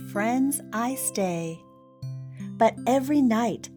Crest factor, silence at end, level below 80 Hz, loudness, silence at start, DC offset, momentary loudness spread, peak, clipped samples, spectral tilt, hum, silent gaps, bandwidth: 16 dB; 0 s; -66 dBFS; -25 LUFS; 0 s; under 0.1%; 16 LU; -10 dBFS; under 0.1%; -5 dB/octave; none; none; over 20 kHz